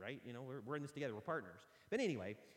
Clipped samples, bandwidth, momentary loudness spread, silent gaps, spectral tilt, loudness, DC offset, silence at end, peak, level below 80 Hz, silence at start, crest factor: under 0.1%; 16.5 kHz; 10 LU; none; -6 dB/octave; -45 LUFS; under 0.1%; 0 s; -28 dBFS; -84 dBFS; 0 s; 18 dB